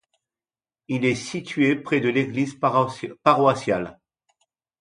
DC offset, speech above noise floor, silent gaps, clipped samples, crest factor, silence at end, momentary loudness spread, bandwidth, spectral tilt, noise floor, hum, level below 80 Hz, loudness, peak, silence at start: under 0.1%; over 68 dB; none; under 0.1%; 22 dB; 0.9 s; 9 LU; 10.5 kHz; -6 dB/octave; under -90 dBFS; none; -62 dBFS; -22 LUFS; -2 dBFS; 0.9 s